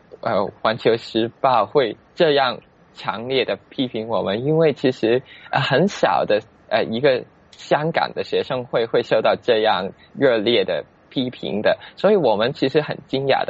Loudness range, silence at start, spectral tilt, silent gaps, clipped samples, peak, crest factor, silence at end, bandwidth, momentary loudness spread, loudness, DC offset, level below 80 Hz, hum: 1 LU; 0.25 s; -3.5 dB/octave; none; under 0.1%; -4 dBFS; 16 dB; 0 s; 8 kHz; 8 LU; -20 LUFS; under 0.1%; -60 dBFS; none